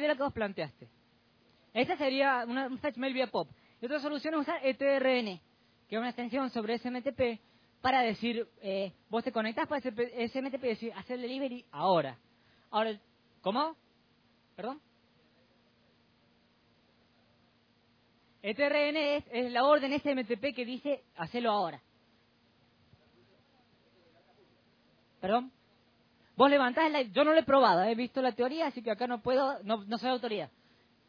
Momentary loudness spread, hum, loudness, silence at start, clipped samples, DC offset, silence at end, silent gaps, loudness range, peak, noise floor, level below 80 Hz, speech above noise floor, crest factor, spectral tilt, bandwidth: 13 LU; none; -32 LUFS; 0 s; under 0.1%; under 0.1%; 0.6 s; none; 13 LU; -10 dBFS; -68 dBFS; -72 dBFS; 37 dB; 24 dB; -6.5 dB/octave; 5.4 kHz